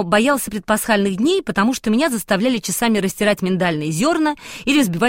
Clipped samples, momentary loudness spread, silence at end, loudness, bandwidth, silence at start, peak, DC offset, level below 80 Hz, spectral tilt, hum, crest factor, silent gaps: under 0.1%; 3 LU; 0 s; -18 LUFS; 16.5 kHz; 0 s; -2 dBFS; 0.2%; -48 dBFS; -4.5 dB/octave; none; 14 dB; none